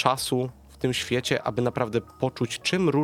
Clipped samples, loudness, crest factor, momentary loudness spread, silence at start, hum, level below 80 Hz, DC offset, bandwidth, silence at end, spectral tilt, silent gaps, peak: under 0.1%; -27 LUFS; 22 dB; 6 LU; 0 s; none; -54 dBFS; under 0.1%; 16.5 kHz; 0 s; -5 dB/octave; none; -4 dBFS